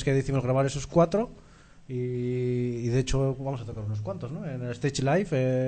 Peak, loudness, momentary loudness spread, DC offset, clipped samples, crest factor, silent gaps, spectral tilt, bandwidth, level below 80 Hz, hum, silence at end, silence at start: -10 dBFS; -28 LUFS; 10 LU; under 0.1%; under 0.1%; 18 dB; none; -6.5 dB/octave; 9.2 kHz; -44 dBFS; none; 0 s; 0 s